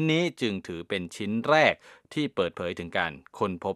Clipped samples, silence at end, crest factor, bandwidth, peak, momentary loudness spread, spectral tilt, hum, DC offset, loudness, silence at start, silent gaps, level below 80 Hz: under 0.1%; 0 s; 24 dB; 13.5 kHz; -4 dBFS; 12 LU; -5.5 dB/octave; none; under 0.1%; -28 LUFS; 0 s; none; -62 dBFS